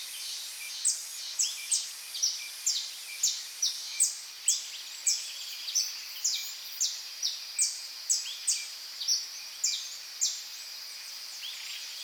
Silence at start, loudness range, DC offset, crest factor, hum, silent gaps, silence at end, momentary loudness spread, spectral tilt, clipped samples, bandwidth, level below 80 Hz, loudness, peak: 0 s; 2 LU; under 0.1%; 20 dB; none; none; 0 s; 10 LU; 6.5 dB/octave; under 0.1%; over 20 kHz; under -90 dBFS; -31 LUFS; -14 dBFS